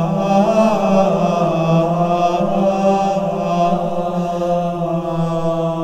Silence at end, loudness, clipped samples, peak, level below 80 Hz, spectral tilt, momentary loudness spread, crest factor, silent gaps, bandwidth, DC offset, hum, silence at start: 0 s; -16 LUFS; under 0.1%; -2 dBFS; -44 dBFS; -7.5 dB/octave; 6 LU; 14 dB; none; 9.4 kHz; under 0.1%; none; 0 s